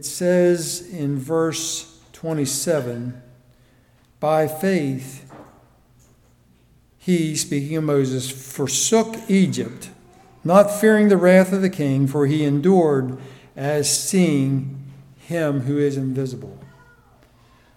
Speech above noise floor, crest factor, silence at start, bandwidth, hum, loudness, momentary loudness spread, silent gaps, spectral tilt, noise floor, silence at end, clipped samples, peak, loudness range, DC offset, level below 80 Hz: 36 dB; 20 dB; 0 s; 17.5 kHz; none; -20 LUFS; 16 LU; none; -5 dB/octave; -56 dBFS; 1.1 s; under 0.1%; 0 dBFS; 9 LU; under 0.1%; -60 dBFS